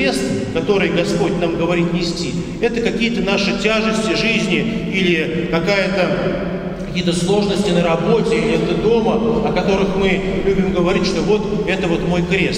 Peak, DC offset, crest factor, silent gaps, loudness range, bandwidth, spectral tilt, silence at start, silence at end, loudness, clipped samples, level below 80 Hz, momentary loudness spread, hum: -2 dBFS; under 0.1%; 14 dB; none; 1 LU; 12 kHz; -5.5 dB/octave; 0 s; 0 s; -17 LUFS; under 0.1%; -34 dBFS; 4 LU; none